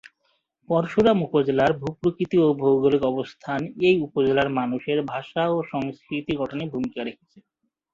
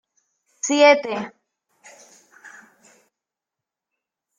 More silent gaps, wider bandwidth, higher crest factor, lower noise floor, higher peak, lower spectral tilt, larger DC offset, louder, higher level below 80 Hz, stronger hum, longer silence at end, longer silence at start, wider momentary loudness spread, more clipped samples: neither; second, 7.4 kHz vs 9.6 kHz; second, 18 dB vs 24 dB; second, -71 dBFS vs -87 dBFS; second, -6 dBFS vs -2 dBFS; first, -7.5 dB/octave vs -2 dB/octave; neither; second, -23 LUFS vs -18 LUFS; first, -58 dBFS vs -76 dBFS; neither; second, 0.8 s vs 1.9 s; second, 0.05 s vs 0.65 s; second, 10 LU vs 17 LU; neither